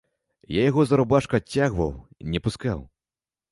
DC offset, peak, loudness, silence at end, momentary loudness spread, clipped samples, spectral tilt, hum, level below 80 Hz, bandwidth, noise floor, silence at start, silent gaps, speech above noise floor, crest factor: under 0.1%; -6 dBFS; -24 LUFS; 0.65 s; 10 LU; under 0.1%; -7 dB/octave; none; -44 dBFS; 11.5 kHz; under -90 dBFS; 0.5 s; none; over 67 dB; 18 dB